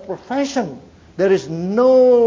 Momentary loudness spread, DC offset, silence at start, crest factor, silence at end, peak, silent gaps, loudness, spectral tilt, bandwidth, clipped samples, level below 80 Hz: 14 LU; under 0.1%; 0.05 s; 12 dB; 0 s; -4 dBFS; none; -17 LUFS; -6 dB/octave; 7.6 kHz; under 0.1%; -54 dBFS